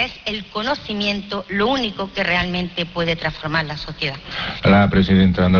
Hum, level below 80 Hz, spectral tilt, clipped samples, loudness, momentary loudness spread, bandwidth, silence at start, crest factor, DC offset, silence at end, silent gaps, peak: none; -38 dBFS; -6.5 dB/octave; under 0.1%; -19 LUFS; 10 LU; 5.4 kHz; 0 s; 18 dB; under 0.1%; 0 s; none; -2 dBFS